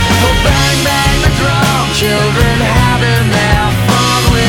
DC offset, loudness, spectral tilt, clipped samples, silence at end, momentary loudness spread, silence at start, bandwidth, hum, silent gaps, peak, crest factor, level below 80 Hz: under 0.1%; -10 LUFS; -4.5 dB/octave; under 0.1%; 0 s; 1 LU; 0 s; 19.5 kHz; none; none; 0 dBFS; 10 dB; -20 dBFS